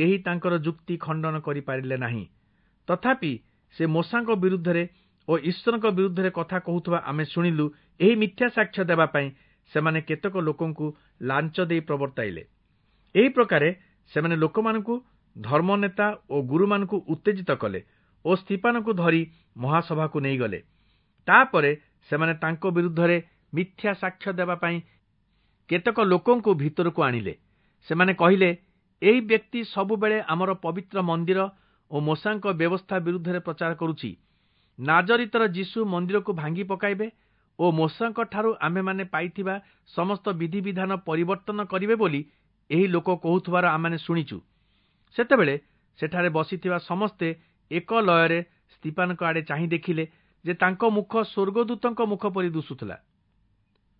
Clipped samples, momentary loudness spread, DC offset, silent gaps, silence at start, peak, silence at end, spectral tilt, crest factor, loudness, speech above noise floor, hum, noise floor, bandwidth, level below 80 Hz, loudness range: under 0.1%; 12 LU; under 0.1%; none; 0 s; -2 dBFS; 1.05 s; -11 dB/octave; 24 dB; -25 LUFS; 43 dB; none; -67 dBFS; 5.2 kHz; -66 dBFS; 4 LU